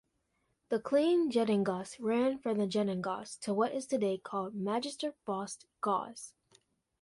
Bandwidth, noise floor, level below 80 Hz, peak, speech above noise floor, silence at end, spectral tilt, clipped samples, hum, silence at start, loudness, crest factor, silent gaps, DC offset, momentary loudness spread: 11.5 kHz; -79 dBFS; -76 dBFS; -16 dBFS; 46 dB; 0.7 s; -5.5 dB/octave; under 0.1%; none; 0.7 s; -33 LUFS; 16 dB; none; under 0.1%; 10 LU